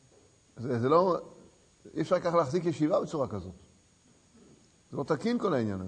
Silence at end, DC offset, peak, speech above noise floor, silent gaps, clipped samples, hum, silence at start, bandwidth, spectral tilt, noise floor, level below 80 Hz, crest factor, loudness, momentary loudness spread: 0 s; under 0.1%; -12 dBFS; 34 dB; none; under 0.1%; none; 0.55 s; 9.6 kHz; -7 dB/octave; -63 dBFS; -66 dBFS; 20 dB; -29 LUFS; 16 LU